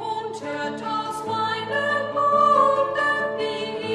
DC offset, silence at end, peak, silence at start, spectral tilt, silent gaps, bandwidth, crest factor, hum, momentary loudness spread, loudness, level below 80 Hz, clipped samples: under 0.1%; 0 s; -8 dBFS; 0 s; -4 dB/octave; none; 12.5 kHz; 16 dB; none; 12 LU; -22 LUFS; -70 dBFS; under 0.1%